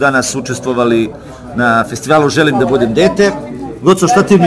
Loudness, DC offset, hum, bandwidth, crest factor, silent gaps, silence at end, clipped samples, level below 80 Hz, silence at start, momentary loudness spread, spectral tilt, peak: -12 LUFS; under 0.1%; none; 11 kHz; 12 dB; none; 0 s; 0.5%; -40 dBFS; 0 s; 12 LU; -5 dB/octave; 0 dBFS